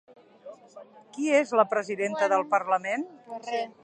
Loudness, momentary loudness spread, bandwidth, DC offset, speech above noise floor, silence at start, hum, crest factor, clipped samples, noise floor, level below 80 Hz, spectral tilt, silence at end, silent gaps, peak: -26 LUFS; 16 LU; 9.6 kHz; under 0.1%; 23 dB; 0.45 s; none; 20 dB; under 0.1%; -50 dBFS; -84 dBFS; -4 dB/octave; 0.15 s; none; -8 dBFS